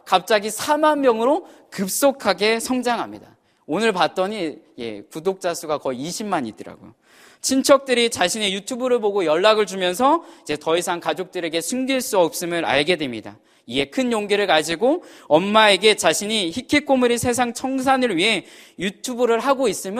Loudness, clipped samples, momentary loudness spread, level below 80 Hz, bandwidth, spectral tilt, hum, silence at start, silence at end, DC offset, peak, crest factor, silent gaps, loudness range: -20 LUFS; under 0.1%; 11 LU; -60 dBFS; 15.5 kHz; -3 dB/octave; none; 0.05 s; 0 s; under 0.1%; 0 dBFS; 20 dB; none; 6 LU